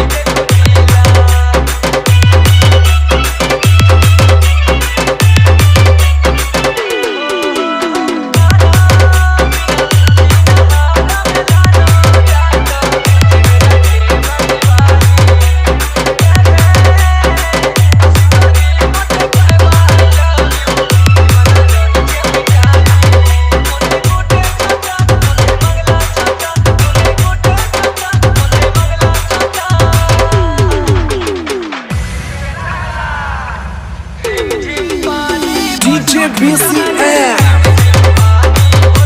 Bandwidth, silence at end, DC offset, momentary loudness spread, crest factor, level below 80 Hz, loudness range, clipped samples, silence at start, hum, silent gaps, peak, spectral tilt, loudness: 16 kHz; 0 s; under 0.1%; 8 LU; 8 dB; -16 dBFS; 5 LU; 0.2%; 0 s; none; none; 0 dBFS; -5 dB/octave; -9 LUFS